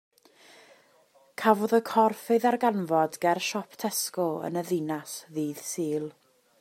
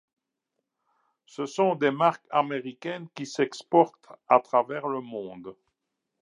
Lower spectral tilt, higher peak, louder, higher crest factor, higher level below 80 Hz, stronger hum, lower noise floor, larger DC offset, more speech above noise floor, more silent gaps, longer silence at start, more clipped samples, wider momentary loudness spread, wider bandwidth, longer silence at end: about the same, -4.5 dB/octave vs -5.5 dB/octave; about the same, -6 dBFS vs -4 dBFS; about the same, -27 LUFS vs -26 LUFS; about the same, 22 dB vs 24 dB; about the same, -80 dBFS vs -82 dBFS; neither; second, -62 dBFS vs -83 dBFS; neither; second, 35 dB vs 57 dB; neither; about the same, 1.4 s vs 1.4 s; neither; second, 10 LU vs 15 LU; first, 16 kHz vs 11 kHz; second, 0.5 s vs 0.7 s